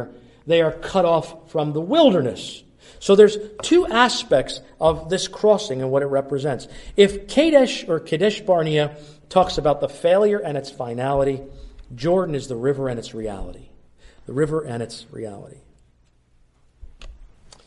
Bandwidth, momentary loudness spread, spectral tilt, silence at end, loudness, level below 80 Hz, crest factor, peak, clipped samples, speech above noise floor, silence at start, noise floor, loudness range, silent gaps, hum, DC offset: 11.5 kHz; 16 LU; -5.5 dB/octave; 0.4 s; -20 LUFS; -46 dBFS; 20 dB; -2 dBFS; under 0.1%; 38 dB; 0 s; -58 dBFS; 12 LU; none; none; under 0.1%